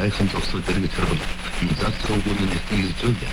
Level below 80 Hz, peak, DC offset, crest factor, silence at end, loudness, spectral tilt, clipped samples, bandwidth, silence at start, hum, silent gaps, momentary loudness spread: -30 dBFS; -8 dBFS; under 0.1%; 14 dB; 0 s; -24 LUFS; -5.5 dB/octave; under 0.1%; 16 kHz; 0 s; none; none; 3 LU